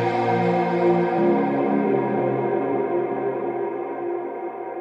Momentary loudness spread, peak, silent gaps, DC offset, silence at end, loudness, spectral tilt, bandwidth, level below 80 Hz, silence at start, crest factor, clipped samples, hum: 8 LU; -8 dBFS; none; under 0.1%; 0 s; -23 LUFS; -9 dB/octave; 6 kHz; -70 dBFS; 0 s; 14 dB; under 0.1%; none